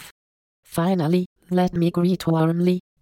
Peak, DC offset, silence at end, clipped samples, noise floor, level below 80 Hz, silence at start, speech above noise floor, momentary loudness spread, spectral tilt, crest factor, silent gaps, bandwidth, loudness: -8 dBFS; under 0.1%; 0.2 s; under 0.1%; under -90 dBFS; -54 dBFS; 0 s; over 70 dB; 5 LU; -7.5 dB/octave; 14 dB; 0.11-0.63 s, 1.26-1.36 s; 16 kHz; -22 LUFS